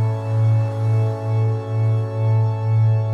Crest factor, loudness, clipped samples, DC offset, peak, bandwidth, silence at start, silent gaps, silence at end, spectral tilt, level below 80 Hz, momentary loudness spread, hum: 8 dB; -20 LUFS; under 0.1%; under 0.1%; -10 dBFS; 4.7 kHz; 0 s; none; 0 s; -9.5 dB/octave; -60 dBFS; 3 LU; none